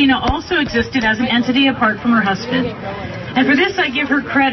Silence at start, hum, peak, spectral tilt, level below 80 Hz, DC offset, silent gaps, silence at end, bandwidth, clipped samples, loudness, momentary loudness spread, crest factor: 0 s; none; -2 dBFS; -5.5 dB/octave; -38 dBFS; under 0.1%; none; 0 s; 6.2 kHz; under 0.1%; -16 LUFS; 7 LU; 14 dB